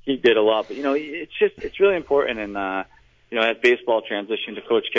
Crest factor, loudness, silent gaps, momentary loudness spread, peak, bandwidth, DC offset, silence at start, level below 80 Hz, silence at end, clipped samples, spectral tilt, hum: 16 dB; -22 LUFS; none; 10 LU; -6 dBFS; 7.8 kHz; under 0.1%; 0.05 s; -56 dBFS; 0 s; under 0.1%; -5 dB/octave; none